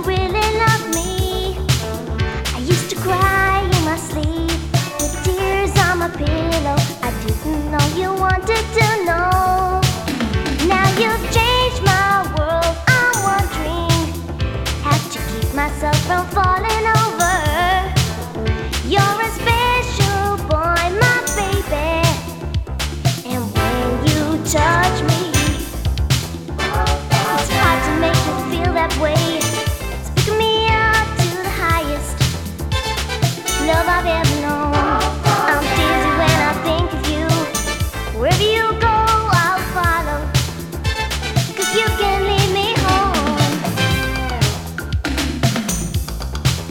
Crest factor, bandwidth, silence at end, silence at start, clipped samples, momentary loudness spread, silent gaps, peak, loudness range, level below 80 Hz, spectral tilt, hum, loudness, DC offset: 18 dB; 19.5 kHz; 0 s; 0 s; under 0.1%; 7 LU; none; 0 dBFS; 2 LU; -26 dBFS; -4.5 dB/octave; none; -17 LUFS; under 0.1%